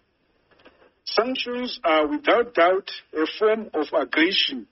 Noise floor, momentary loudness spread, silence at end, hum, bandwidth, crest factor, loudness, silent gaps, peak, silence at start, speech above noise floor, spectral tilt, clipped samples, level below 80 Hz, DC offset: -67 dBFS; 8 LU; 0.1 s; none; 6 kHz; 18 dB; -22 LUFS; none; -6 dBFS; 1.05 s; 44 dB; 0 dB/octave; under 0.1%; -64 dBFS; under 0.1%